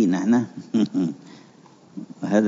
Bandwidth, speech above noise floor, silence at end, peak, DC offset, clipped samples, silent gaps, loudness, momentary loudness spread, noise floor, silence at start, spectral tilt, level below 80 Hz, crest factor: 7.6 kHz; 29 dB; 0 s; -6 dBFS; under 0.1%; under 0.1%; none; -23 LUFS; 20 LU; -50 dBFS; 0 s; -7 dB/octave; -72 dBFS; 18 dB